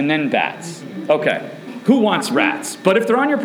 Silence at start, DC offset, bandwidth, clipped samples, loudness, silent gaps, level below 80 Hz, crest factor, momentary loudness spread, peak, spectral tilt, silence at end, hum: 0 s; under 0.1%; 16.5 kHz; under 0.1%; -17 LUFS; none; -72 dBFS; 16 dB; 14 LU; -2 dBFS; -5 dB/octave; 0 s; none